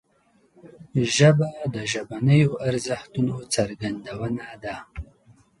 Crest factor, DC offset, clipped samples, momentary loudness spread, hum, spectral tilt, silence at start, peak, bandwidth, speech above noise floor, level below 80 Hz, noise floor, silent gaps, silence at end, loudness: 20 dB; under 0.1%; under 0.1%; 17 LU; none; -5.5 dB/octave; 0.65 s; -4 dBFS; 11.5 kHz; 40 dB; -50 dBFS; -63 dBFS; none; 0.55 s; -23 LUFS